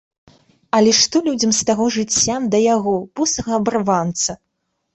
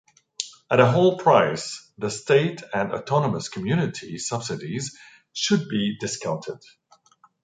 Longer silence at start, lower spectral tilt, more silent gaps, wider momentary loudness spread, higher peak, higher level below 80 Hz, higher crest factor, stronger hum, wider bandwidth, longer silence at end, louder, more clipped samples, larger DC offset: first, 0.75 s vs 0.4 s; second, -3 dB/octave vs -5 dB/octave; neither; second, 7 LU vs 15 LU; about the same, -2 dBFS vs -2 dBFS; first, -52 dBFS vs -62 dBFS; second, 16 dB vs 22 dB; neither; second, 8.4 kHz vs 9.6 kHz; second, 0.6 s vs 0.85 s; first, -17 LUFS vs -23 LUFS; neither; neither